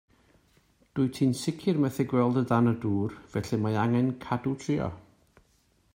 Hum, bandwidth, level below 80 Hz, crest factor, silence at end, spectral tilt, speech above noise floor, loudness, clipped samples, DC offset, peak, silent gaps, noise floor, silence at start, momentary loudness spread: none; 16 kHz; -60 dBFS; 20 dB; 0.95 s; -7.5 dB/octave; 40 dB; -28 LUFS; under 0.1%; under 0.1%; -10 dBFS; none; -67 dBFS; 0.95 s; 7 LU